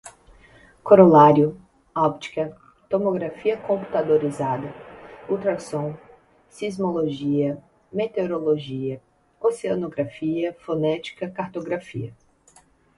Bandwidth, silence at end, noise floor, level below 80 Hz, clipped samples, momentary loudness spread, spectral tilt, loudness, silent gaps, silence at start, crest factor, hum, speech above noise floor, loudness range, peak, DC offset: 11.5 kHz; 0.85 s; -56 dBFS; -60 dBFS; under 0.1%; 17 LU; -7.5 dB/octave; -22 LUFS; none; 0.05 s; 22 dB; none; 35 dB; 9 LU; 0 dBFS; under 0.1%